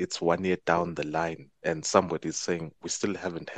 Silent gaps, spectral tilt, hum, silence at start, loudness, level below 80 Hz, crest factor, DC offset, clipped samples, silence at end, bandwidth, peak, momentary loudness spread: none; -4 dB/octave; none; 0 s; -29 LUFS; -62 dBFS; 24 dB; under 0.1%; under 0.1%; 0 s; 9.4 kHz; -4 dBFS; 9 LU